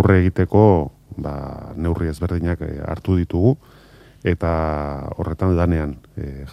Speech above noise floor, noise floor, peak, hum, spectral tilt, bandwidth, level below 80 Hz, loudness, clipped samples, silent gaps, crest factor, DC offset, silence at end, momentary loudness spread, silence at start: 25 dB; -44 dBFS; 0 dBFS; none; -9.5 dB/octave; 9.8 kHz; -36 dBFS; -20 LUFS; under 0.1%; none; 18 dB; under 0.1%; 0 s; 15 LU; 0 s